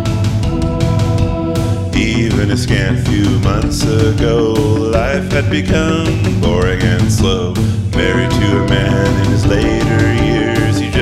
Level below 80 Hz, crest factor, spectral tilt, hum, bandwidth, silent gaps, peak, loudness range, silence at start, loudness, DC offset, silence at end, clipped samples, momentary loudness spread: -24 dBFS; 12 dB; -6 dB/octave; none; 14 kHz; none; 0 dBFS; 1 LU; 0 s; -14 LUFS; under 0.1%; 0 s; under 0.1%; 3 LU